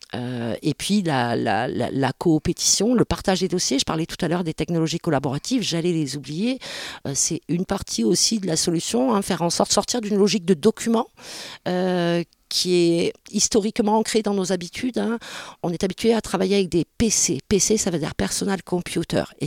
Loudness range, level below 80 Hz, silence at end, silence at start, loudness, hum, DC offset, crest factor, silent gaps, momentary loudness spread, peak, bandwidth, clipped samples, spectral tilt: 3 LU; -48 dBFS; 0 s; 0.15 s; -22 LUFS; none; under 0.1%; 18 dB; none; 8 LU; -4 dBFS; 16.5 kHz; under 0.1%; -4 dB/octave